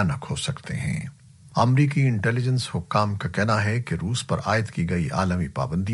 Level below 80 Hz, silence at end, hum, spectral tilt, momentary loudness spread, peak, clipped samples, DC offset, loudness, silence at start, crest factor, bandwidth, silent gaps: -48 dBFS; 0 s; none; -6 dB/octave; 8 LU; -4 dBFS; under 0.1%; under 0.1%; -24 LUFS; 0 s; 20 dB; 11.5 kHz; none